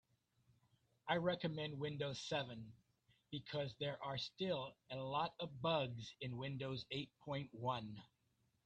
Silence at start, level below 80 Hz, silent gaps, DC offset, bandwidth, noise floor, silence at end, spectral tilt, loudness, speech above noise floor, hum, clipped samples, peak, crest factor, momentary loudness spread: 1.05 s; -76 dBFS; none; under 0.1%; 9 kHz; -82 dBFS; 0.6 s; -5.5 dB/octave; -44 LUFS; 38 dB; none; under 0.1%; -24 dBFS; 22 dB; 11 LU